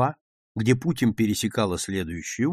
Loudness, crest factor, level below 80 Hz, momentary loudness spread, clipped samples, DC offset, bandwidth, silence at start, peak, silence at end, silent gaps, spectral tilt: -25 LUFS; 18 dB; -52 dBFS; 7 LU; under 0.1%; under 0.1%; 15.5 kHz; 0 s; -6 dBFS; 0 s; 0.21-0.55 s; -5.5 dB/octave